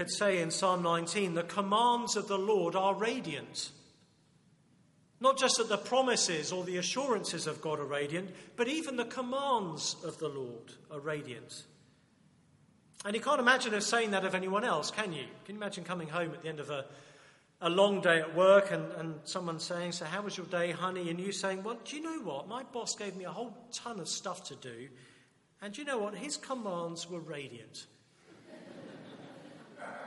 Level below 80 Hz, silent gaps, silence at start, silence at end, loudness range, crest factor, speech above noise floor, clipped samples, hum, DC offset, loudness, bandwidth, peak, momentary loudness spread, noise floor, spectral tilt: -82 dBFS; none; 0 s; 0 s; 10 LU; 24 dB; 33 dB; under 0.1%; none; under 0.1%; -33 LUFS; 11.5 kHz; -10 dBFS; 18 LU; -66 dBFS; -3 dB/octave